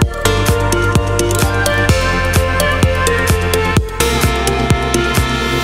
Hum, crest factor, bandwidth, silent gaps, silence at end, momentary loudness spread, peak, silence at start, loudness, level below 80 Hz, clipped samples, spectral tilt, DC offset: none; 14 dB; 16.5 kHz; none; 0 s; 2 LU; 0 dBFS; 0 s; -14 LUFS; -22 dBFS; under 0.1%; -4.5 dB/octave; 1%